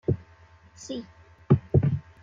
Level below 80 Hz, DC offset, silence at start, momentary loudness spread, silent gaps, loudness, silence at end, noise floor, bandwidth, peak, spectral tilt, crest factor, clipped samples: -50 dBFS; under 0.1%; 0.1 s; 16 LU; none; -26 LUFS; 0.2 s; -54 dBFS; 7.4 kHz; -6 dBFS; -8.5 dB/octave; 22 dB; under 0.1%